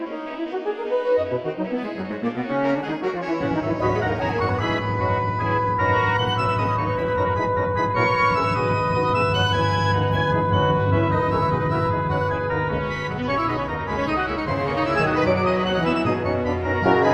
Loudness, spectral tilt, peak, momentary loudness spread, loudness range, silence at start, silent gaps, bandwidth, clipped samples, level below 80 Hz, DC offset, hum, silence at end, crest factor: -22 LUFS; -7 dB/octave; -6 dBFS; 6 LU; 4 LU; 0 s; none; 8.4 kHz; under 0.1%; -42 dBFS; under 0.1%; none; 0 s; 16 dB